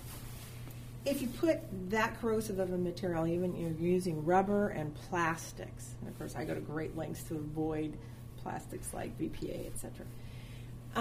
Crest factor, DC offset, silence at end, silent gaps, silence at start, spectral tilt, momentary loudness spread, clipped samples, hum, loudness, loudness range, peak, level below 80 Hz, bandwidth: 20 dB; under 0.1%; 0 s; none; 0 s; -6 dB/octave; 14 LU; under 0.1%; none; -36 LUFS; 7 LU; -16 dBFS; -54 dBFS; 15.5 kHz